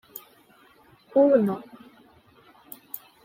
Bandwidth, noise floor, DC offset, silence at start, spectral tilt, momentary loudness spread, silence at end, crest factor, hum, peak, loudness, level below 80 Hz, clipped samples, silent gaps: 16.5 kHz; -57 dBFS; under 0.1%; 0.15 s; -7.5 dB/octave; 25 LU; 0.3 s; 20 dB; none; -8 dBFS; -22 LUFS; -74 dBFS; under 0.1%; none